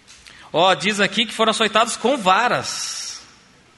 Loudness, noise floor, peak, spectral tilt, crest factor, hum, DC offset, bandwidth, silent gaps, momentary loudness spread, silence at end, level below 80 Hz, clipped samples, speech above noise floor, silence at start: -18 LUFS; -50 dBFS; -2 dBFS; -2.5 dB/octave; 18 dB; none; under 0.1%; 11.5 kHz; none; 10 LU; 0.55 s; -62 dBFS; under 0.1%; 32 dB; 0.1 s